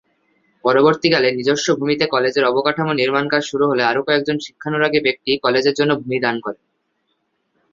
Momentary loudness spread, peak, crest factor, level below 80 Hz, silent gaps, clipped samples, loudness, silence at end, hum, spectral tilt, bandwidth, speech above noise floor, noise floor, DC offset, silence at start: 8 LU; 0 dBFS; 18 dB; -60 dBFS; none; under 0.1%; -17 LUFS; 1.2 s; none; -4.5 dB/octave; 7.6 kHz; 52 dB; -69 dBFS; under 0.1%; 0.65 s